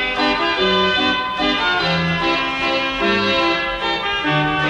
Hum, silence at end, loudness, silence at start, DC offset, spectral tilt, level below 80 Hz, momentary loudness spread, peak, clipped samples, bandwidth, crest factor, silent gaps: none; 0 s; -17 LUFS; 0 s; under 0.1%; -5 dB/octave; -42 dBFS; 3 LU; -4 dBFS; under 0.1%; 11 kHz; 14 dB; none